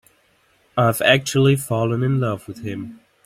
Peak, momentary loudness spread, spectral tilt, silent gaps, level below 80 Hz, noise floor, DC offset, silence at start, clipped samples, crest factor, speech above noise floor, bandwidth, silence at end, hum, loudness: 0 dBFS; 15 LU; -5.5 dB/octave; none; -56 dBFS; -60 dBFS; under 0.1%; 0.75 s; under 0.1%; 20 dB; 41 dB; 16 kHz; 0.3 s; none; -19 LUFS